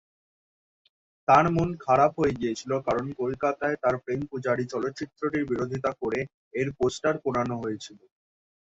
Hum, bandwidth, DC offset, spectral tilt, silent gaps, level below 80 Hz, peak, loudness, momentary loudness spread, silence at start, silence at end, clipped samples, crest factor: none; 8 kHz; under 0.1%; -6.5 dB/octave; 6.34-6.51 s; -56 dBFS; -6 dBFS; -27 LUFS; 11 LU; 1.3 s; 0.65 s; under 0.1%; 20 dB